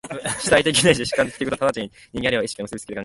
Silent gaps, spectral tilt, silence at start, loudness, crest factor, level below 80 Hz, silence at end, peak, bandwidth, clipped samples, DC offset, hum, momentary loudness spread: none; -3.5 dB/octave; 0.05 s; -20 LUFS; 20 dB; -48 dBFS; 0 s; -2 dBFS; 12 kHz; under 0.1%; under 0.1%; none; 14 LU